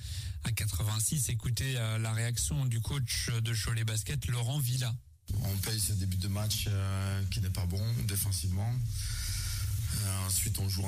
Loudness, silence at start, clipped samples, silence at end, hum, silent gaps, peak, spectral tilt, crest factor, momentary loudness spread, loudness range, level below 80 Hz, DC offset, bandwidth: -32 LUFS; 0 s; under 0.1%; 0 s; none; none; -18 dBFS; -4 dB/octave; 14 dB; 4 LU; 1 LU; -44 dBFS; under 0.1%; 15.5 kHz